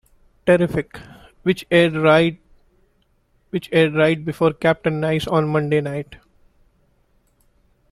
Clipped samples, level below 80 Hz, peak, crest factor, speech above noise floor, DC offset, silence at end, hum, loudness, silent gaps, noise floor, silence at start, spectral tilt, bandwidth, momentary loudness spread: under 0.1%; -50 dBFS; -4 dBFS; 18 dB; 44 dB; under 0.1%; 1.75 s; none; -19 LUFS; none; -62 dBFS; 0.45 s; -7 dB/octave; 13.5 kHz; 14 LU